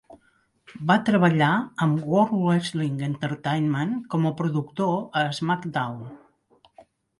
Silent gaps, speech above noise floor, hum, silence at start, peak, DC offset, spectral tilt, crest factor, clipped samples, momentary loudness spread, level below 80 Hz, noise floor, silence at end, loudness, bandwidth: none; 42 dB; none; 0.1 s; -6 dBFS; under 0.1%; -7 dB/octave; 18 dB; under 0.1%; 9 LU; -64 dBFS; -65 dBFS; 1 s; -24 LUFS; 11.5 kHz